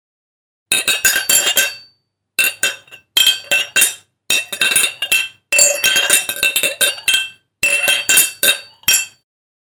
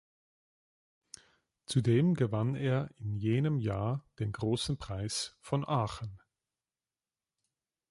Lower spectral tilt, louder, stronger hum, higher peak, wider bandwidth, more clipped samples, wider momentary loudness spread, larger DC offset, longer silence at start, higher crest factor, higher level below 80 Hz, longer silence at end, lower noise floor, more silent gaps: second, 2 dB/octave vs -6 dB/octave; first, -13 LUFS vs -33 LUFS; neither; first, 0 dBFS vs -16 dBFS; first, over 20 kHz vs 11.5 kHz; neither; second, 8 LU vs 18 LU; neither; second, 0.7 s vs 1.7 s; about the same, 16 dB vs 18 dB; about the same, -58 dBFS vs -58 dBFS; second, 0.55 s vs 1.75 s; second, -62 dBFS vs under -90 dBFS; neither